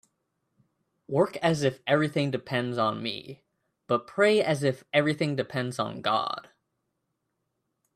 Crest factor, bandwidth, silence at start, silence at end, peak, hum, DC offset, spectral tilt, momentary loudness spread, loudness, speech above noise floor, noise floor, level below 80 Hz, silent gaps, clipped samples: 20 dB; 13.5 kHz; 1.1 s; 1.55 s; -8 dBFS; none; under 0.1%; -5.5 dB/octave; 10 LU; -27 LUFS; 53 dB; -80 dBFS; -70 dBFS; none; under 0.1%